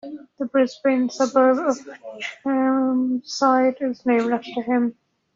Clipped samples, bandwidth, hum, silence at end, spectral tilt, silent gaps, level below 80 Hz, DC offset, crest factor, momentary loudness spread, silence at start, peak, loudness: under 0.1%; 7.6 kHz; none; 0.45 s; -3 dB/octave; none; -68 dBFS; under 0.1%; 16 dB; 12 LU; 0.05 s; -6 dBFS; -21 LUFS